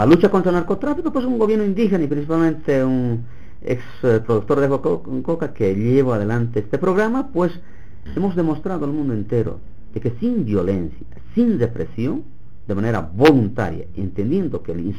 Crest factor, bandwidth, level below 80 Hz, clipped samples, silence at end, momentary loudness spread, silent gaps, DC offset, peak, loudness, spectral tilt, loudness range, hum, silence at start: 20 dB; 12.5 kHz; -42 dBFS; under 0.1%; 0 s; 10 LU; none; 4%; 0 dBFS; -20 LUFS; -8.5 dB/octave; 3 LU; none; 0 s